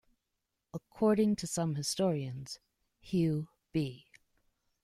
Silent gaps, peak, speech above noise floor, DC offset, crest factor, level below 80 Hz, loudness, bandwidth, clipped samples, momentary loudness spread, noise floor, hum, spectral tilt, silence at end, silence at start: none; -16 dBFS; 54 dB; under 0.1%; 18 dB; -66 dBFS; -33 LUFS; 15 kHz; under 0.1%; 18 LU; -85 dBFS; none; -6 dB/octave; 0.85 s; 0.75 s